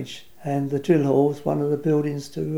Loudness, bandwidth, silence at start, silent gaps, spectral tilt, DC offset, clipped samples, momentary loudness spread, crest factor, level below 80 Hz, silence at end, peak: -23 LUFS; 16.5 kHz; 0 s; none; -8 dB/octave; 0.4%; under 0.1%; 10 LU; 18 dB; -62 dBFS; 0 s; -6 dBFS